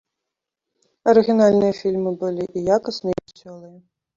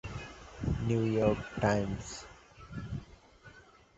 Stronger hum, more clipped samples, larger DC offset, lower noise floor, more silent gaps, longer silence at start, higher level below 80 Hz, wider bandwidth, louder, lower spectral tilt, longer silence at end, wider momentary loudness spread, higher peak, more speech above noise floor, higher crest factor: neither; neither; neither; first, -83 dBFS vs -57 dBFS; neither; first, 1.05 s vs 0.05 s; second, -58 dBFS vs -48 dBFS; about the same, 7.6 kHz vs 8.2 kHz; first, -19 LUFS vs -33 LUFS; about the same, -6.5 dB/octave vs -6.5 dB/octave; first, 0.5 s vs 0.35 s; second, 10 LU vs 17 LU; first, -2 dBFS vs -12 dBFS; first, 65 dB vs 26 dB; about the same, 18 dB vs 22 dB